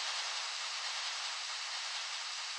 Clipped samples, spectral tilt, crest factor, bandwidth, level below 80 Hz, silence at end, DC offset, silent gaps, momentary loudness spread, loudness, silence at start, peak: under 0.1%; 8 dB/octave; 14 dB; 11.5 kHz; under -90 dBFS; 0 s; under 0.1%; none; 2 LU; -37 LUFS; 0 s; -26 dBFS